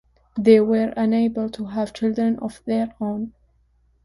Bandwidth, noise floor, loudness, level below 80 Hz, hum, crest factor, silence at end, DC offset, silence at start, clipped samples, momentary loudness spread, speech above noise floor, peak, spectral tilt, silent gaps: 11.5 kHz; -61 dBFS; -21 LUFS; -56 dBFS; none; 18 dB; 0.75 s; under 0.1%; 0.35 s; under 0.1%; 12 LU; 41 dB; -2 dBFS; -7.5 dB/octave; none